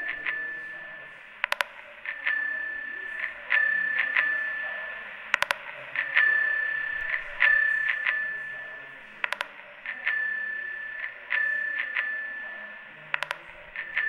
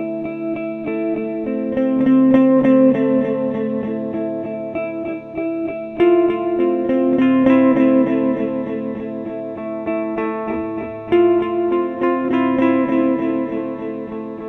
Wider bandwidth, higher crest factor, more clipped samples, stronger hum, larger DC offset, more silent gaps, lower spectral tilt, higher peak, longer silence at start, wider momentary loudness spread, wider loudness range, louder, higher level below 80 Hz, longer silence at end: first, 15.5 kHz vs 3.9 kHz; first, 28 dB vs 16 dB; neither; neither; neither; neither; second, -0.5 dB/octave vs -9.5 dB/octave; about the same, 0 dBFS vs 0 dBFS; about the same, 0 s vs 0 s; first, 16 LU vs 13 LU; about the same, 6 LU vs 5 LU; second, -27 LUFS vs -18 LUFS; second, -64 dBFS vs -54 dBFS; about the same, 0 s vs 0 s